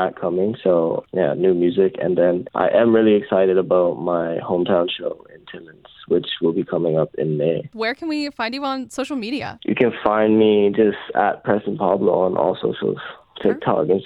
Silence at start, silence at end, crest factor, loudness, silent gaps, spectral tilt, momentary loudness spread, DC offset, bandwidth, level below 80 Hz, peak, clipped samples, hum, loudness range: 0 s; 0 s; 18 dB; -19 LUFS; none; -7 dB/octave; 10 LU; under 0.1%; 11.5 kHz; -60 dBFS; -2 dBFS; under 0.1%; none; 5 LU